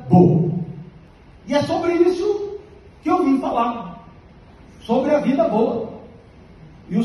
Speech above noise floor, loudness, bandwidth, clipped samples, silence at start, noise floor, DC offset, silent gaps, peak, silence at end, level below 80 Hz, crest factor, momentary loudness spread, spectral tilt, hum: 28 dB; -19 LUFS; 11.5 kHz; under 0.1%; 0 s; -45 dBFS; under 0.1%; none; -2 dBFS; 0 s; -50 dBFS; 18 dB; 17 LU; -8.5 dB/octave; none